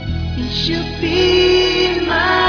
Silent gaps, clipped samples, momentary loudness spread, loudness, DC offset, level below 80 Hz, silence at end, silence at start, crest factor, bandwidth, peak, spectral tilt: none; under 0.1%; 9 LU; -15 LUFS; under 0.1%; -30 dBFS; 0 s; 0 s; 12 dB; 5.4 kHz; -2 dBFS; -5 dB/octave